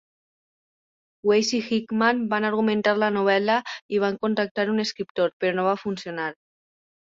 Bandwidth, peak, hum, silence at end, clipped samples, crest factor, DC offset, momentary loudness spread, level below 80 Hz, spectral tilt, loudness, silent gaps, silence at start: 7.6 kHz; -6 dBFS; none; 0.7 s; under 0.1%; 18 dB; under 0.1%; 7 LU; -70 dBFS; -4.5 dB/octave; -24 LUFS; 3.81-3.89 s, 4.51-4.55 s, 5.10-5.15 s, 5.33-5.40 s; 1.25 s